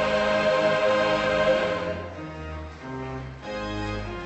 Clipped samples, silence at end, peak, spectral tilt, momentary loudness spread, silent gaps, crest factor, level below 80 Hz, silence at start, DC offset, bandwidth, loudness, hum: under 0.1%; 0 s; -10 dBFS; -5 dB/octave; 15 LU; none; 16 dB; -44 dBFS; 0 s; under 0.1%; 8.4 kHz; -25 LUFS; none